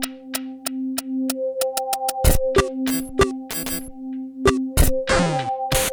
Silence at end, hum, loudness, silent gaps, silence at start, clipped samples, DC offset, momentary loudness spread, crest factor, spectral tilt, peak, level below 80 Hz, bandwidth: 0 s; none; -22 LUFS; none; 0 s; under 0.1%; under 0.1%; 9 LU; 20 dB; -4 dB/octave; -2 dBFS; -28 dBFS; over 20 kHz